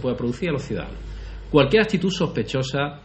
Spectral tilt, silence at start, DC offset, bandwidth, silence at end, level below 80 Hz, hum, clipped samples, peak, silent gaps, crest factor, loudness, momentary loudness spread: -6 dB/octave; 0 s; under 0.1%; 8.4 kHz; 0 s; -38 dBFS; none; under 0.1%; -2 dBFS; none; 20 dB; -22 LUFS; 18 LU